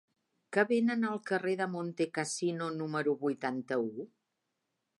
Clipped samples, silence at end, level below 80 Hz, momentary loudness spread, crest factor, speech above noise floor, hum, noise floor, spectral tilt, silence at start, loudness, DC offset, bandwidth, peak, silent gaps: under 0.1%; 0.95 s; -86 dBFS; 7 LU; 20 dB; 51 dB; none; -84 dBFS; -5 dB/octave; 0.5 s; -33 LUFS; under 0.1%; 11.5 kHz; -14 dBFS; none